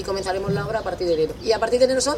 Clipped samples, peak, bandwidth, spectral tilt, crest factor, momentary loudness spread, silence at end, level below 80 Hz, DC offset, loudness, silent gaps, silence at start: under 0.1%; -6 dBFS; 15 kHz; -4 dB/octave; 16 dB; 6 LU; 0 s; -42 dBFS; under 0.1%; -22 LUFS; none; 0 s